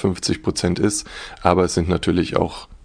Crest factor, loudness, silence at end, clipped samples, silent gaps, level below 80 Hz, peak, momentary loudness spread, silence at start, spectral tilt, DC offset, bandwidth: 20 dB; -20 LUFS; 0.1 s; under 0.1%; none; -38 dBFS; 0 dBFS; 7 LU; 0 s; -5 dB/octave; under 0.1%; 10 kHz